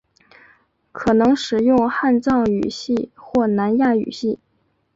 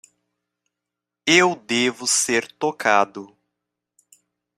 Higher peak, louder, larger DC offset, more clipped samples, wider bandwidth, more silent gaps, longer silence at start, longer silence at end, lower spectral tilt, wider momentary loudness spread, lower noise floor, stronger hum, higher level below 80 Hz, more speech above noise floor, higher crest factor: about the same, -4 dBFS vs -2 dBFS; about the same, -19 LUFS vs -19 LUFS; neither; neither; second, 7.8 kHz vs 15.5 kHz; neither; second, 0.95 s vs 1.25 s; second, 0.6 s vs 1.3 s; first, -6 dB/octave vs -2 dB/octave; second, 8 LU vs 11 LU; second, -66 dBFS vs -85 dBFS; second, none vs 60 Hz at -50 dBFS; first, -50 dBFS vs -68 dBFS; second, 48 dB vs 65 dB; second, 14 dB vs 22 dB